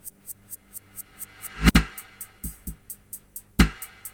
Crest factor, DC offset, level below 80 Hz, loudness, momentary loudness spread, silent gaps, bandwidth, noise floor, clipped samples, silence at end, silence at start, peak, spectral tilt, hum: 26 dB; under 0.1%; -32 dBFS; -25 LUFS; 20 LU; none; over 20 kHz; -44 dBFS; under 0.1%; 0.05 s; 0.05 s; -2 dBFS; -4.5 dB/octave; none